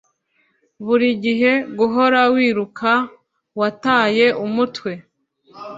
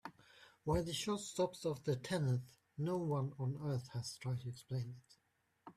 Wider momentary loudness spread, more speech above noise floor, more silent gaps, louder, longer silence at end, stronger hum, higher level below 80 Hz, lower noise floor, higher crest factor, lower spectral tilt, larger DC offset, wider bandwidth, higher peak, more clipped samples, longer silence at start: first, 16 LU vs 9 LU; first, 47 dB vs 41 dB; neither; first, -17 LUFS vs -41 LUFS; about the same, 0 s vs 0.05 s; neither; about the same, -64 dBFS vs -64 dBFS; second, -64 dBFS vs -80 dBFS; about the same, 16 dB vs 18 dB; about the same, -6 dB/octave vs -6 dB/octave; neither; second, 7.8 kHz vs 14 kHz; first, -2 dBFS vs -24 dBFS; neither; first, 0.8 s vs 0.05 s